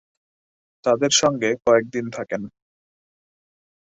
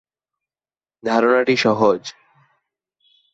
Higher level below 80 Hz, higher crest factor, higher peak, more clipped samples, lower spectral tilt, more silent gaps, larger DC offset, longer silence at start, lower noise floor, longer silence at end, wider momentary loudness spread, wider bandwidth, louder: about the same, -62 dBFS vs -64 dBFS; about the same, 20 dB vs 18 dB; about the same, -4 dBFS vs -4 dBFS; neither; second, -3 dB/octave vs -5 dB/octave; neither; neither; second, 0.85 s vs 1.05 s; about the same, under -90 dBFS vs under -90 dBFS; first, 1.5 s vs 1.2 s; about the same, 12 LU vs 13 LU; about the same, 8.2 kHz vs 8 kHz; second, -21 LUFS vs -18 LUFS